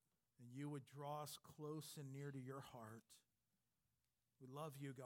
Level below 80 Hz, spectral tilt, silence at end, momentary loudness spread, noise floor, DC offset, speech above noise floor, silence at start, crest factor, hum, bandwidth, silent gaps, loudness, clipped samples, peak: under -90 dBFS; -5.5 dB/octave; 0 s; 9 LU; under -90 dBFS; under 0.1%; over 36 dB; 0.4 s; 18 dB; none; 17.5 kHz; none; -55 LUFS; under 0.1%; -38 dBFS